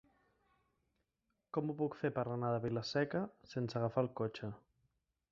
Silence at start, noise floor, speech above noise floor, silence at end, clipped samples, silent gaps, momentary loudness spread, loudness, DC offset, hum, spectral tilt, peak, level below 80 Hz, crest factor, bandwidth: 1.55 s; -86 dBFS; 48 dB; 0.75 s; under 0.1%; none; 7 LU; -39 LUFS; under 0.1%; none; -6 dB/octave; -20 dBFS; -72 dBFS; 20 dB; 7.4 kHz